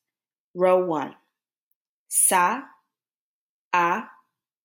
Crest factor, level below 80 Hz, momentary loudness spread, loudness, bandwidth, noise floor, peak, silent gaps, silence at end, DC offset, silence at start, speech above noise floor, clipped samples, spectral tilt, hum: 20 dB; -84 dBFS; 14 LU; -22 LUFS; 18 kHz; under -90 dBFS; -6 dBFS; 1.57-2.06 s, 3.15-3.71 s; 0.6 s; under 0.1%; 0.55 s; over 68 dB; under 0.1%; -2.5 dB/octave; none